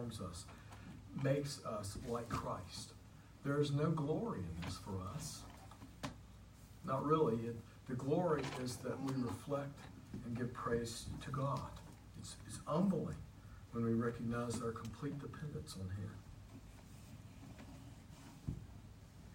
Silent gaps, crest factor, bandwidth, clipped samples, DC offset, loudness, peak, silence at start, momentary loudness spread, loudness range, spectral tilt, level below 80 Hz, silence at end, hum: none; 22 dB; 16 kHz; under 0.1%; under 0.1%; -42 LUFS; -22 dBFS; 0 s; 20 LU; 9 LU; -6.5 dB/octave; -62 dBFS; 0 s; none